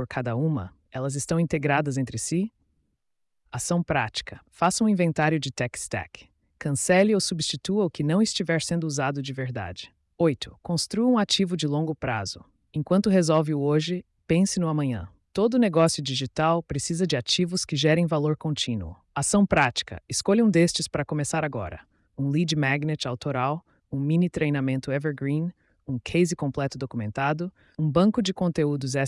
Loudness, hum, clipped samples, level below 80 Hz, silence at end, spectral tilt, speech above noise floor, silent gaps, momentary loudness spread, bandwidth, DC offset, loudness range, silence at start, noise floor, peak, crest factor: -25 LUFS; none; under 0.1%; -54 dBFS; 0 s; -5 dB/octave; 50 dB; none; 12 LU; 12 kHz; under 0.1%; 4 LU; 0 s; -75 dBFS; -8 dBFS; 16 dB